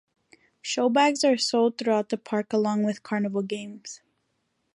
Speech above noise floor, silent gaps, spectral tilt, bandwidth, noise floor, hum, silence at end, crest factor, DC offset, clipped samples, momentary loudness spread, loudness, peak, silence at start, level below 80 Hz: 50 dB; none; -4 dB/octave; 11.5 kHz; -75 dBFS; none; 0.8 s; 18 dB; under 0.1%; under 0.1%; 17 LU; -25 LUFS; -8 dBFS; 0.65 s; -78 dBFS